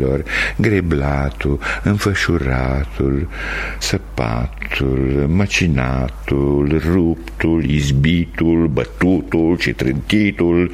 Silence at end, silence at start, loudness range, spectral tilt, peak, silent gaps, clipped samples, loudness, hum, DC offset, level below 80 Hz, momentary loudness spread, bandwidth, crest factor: 0 s; 0 s; 3 LU; -6.5 dB/octave; 0 dBFS; none; under 0.1%; -17 LUFS; none; under 0.1%; -26 dBFS; 6 LU; 15 kHz; 16 dB